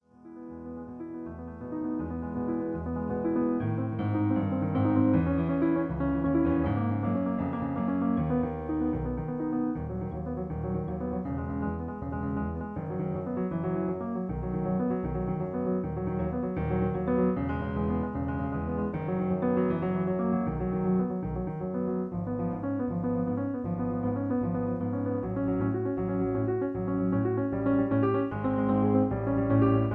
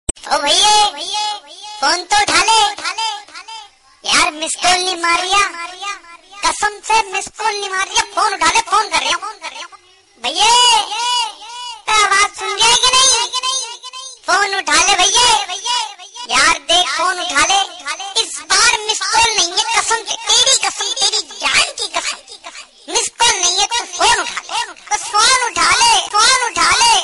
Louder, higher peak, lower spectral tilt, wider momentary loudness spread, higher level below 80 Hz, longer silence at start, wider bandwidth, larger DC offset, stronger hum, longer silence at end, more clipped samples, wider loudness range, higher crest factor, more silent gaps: second, -30 LUFS vs -13 LUFS; second, -12 dBFS vs 0 dBFS; first, -12 dB/octave vs 1.5 dB/octave; second, 8 LU vs 16 LU; about the same, -46 dBFS vs -46 dBFS; first, 0.25 s vs 0.1 s; second, 3.9 kHz vs 12 kHz; neither; neither; about the same, 0 s vs 0 s; neither; about the same, 5 LU vs 4 LU; about the same, 16 dB vs 14 dB; neither